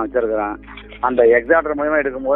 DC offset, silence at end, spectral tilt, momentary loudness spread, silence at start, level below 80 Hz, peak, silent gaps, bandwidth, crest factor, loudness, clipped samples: under 0.1%; 0 s; -10 dB/octave; 13 LU; 0 s; -42 dBFS; 0 dBFS; none; 3.9 kHz; 16 dB; -17 LUFS; under 0.1%